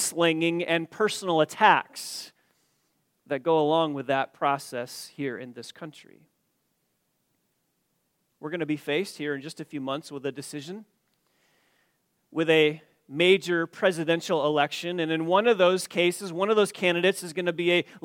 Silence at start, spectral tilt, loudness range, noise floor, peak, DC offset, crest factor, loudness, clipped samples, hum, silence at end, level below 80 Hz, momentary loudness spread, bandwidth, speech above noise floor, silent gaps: 0 s; -4 dB/octave; 13 LU; -75 dBFS; -4 dBFS; under 0.1%; 24 dB; -25 LUFS; under 0.1%; none; 0.05 s; -80 dBFS; 17 LU; 17 kHz; 49 dB; none